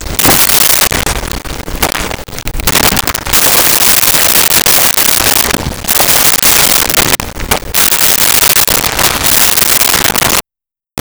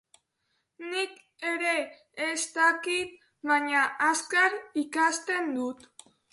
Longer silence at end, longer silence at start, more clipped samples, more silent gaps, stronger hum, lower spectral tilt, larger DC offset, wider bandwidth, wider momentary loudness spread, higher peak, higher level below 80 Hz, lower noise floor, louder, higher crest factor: second, 0 s vs 0.55 s; second, 0 s vs 0.8 s; neither; neither; neither; about the same, -1 dB/octave vs -0.5 dB/octave; first, 0.7% vs under 0.1%; first, over 20 kHz vs 11.5 kHz; about the same, 10 LU vs 12 LU; first, 0 dBFS vs -10 dBFS; first, -26 dBFS vs -78 dBFS; first, -87 dBFS vs -77 dBFS; first, -6 LUFS vs -27 LUFS; second, 10 dB vs 18 dB